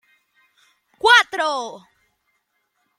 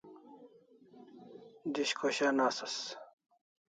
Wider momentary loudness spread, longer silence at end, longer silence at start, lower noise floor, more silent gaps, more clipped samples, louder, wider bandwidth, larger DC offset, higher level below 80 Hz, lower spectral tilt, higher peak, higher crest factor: second, 15 LU vs 25 LU; first, 1.2 s vs 0.65 s; first, 1.05 s vs 0.05 s; first, -71 dBFS vs -61 dBFS; neither; neither; first, -16 LUFS vs -34 LUFS; first, 15 kHz vs 9.4 kHz; neither; first, -68 dBFS vs -88 dBFS; second, 0.5 dB/octave vs -2.5 dB/octave; first, -2 dBFS vs -18 dBFS; about the same, 22 dB vs 20 dB